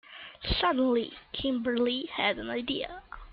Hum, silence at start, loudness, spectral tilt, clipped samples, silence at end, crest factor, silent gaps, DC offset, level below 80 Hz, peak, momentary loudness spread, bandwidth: none; 0.1 s; -30 LUFS; -8.5 dB/octave; under 0.1%; 0 s; 18 dB; none; under 0.1%; -46 dBFS; -12 dBFS; 12 LU; 5.4 kHz